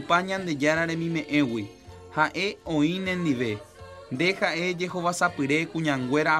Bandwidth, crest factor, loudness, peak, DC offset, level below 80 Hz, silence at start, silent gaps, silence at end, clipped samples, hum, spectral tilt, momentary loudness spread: 14 kHz; 20 dB; -26 LUFS; -6 dBFS; under 0.1%; -60 dBFS; 0 s; none; 0 s; under 0.1%; none; -5 dB/octave; 10 LU